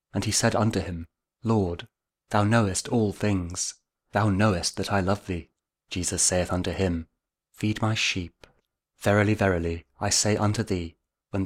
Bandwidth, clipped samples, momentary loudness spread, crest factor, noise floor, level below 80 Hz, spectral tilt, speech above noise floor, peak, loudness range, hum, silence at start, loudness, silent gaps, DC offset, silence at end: 15.5 kHz; under 0.1%; 12 LU; 20 dB; -70 dBFS; -48 dBFS; -4.5 dB/octave; 45 dB; -6 dBFS; 2 LU; none; 0.15 s; -26 LUFS; none; under 0.1%; 0 s